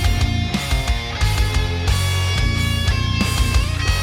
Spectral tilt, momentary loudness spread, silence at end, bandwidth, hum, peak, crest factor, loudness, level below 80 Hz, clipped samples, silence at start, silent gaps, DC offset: -4.5 dB/octave; 2 LU; 0 s; 16.5 kHz; none; -4 dBFS; 14 dB; -19 LUFS; -22 dBFS; under 0.1%; 0 s; none; under 0.1%